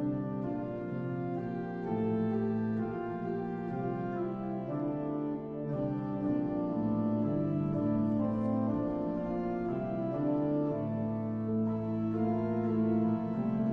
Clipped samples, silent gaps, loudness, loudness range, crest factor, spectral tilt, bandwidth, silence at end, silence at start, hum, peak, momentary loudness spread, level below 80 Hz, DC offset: under 0.1%; none; -33 LUFS; 3 LU; 12 dB; -11.5 dB/octave; 4.5 kHz; 0 s; 0 s; none; -20 dBFS; 6 LU; -58 dBFS; under 0.1%